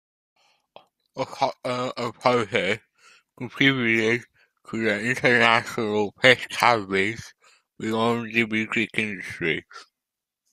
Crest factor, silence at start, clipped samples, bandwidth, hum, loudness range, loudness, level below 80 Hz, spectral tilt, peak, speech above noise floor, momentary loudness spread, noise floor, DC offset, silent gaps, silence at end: 24 dB; 1.15 s; under 0.1%; 15 kHz; none; 6 LU; -23 LUFS; -64 dBFS; -4.5 dB/octave; -2 dBFS; 63 dB; 13 LU; -87 dBFS; under 0.1%; none; 0.7 s